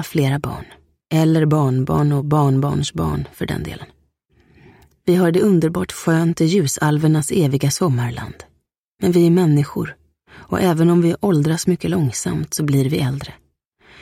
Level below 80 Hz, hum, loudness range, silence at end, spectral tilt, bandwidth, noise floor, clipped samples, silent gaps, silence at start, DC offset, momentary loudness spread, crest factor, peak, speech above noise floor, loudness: -44 dBFS; none; 3 LU; 0.7 s; -6.5 dB/octave; 16 kHz; -65 dBFS; under 0.1%; 8.78-8.95 s; 0 s; under 0.1%; 11 LU; 14 dB; -4 dBFS; 48 dB; -18 LUFS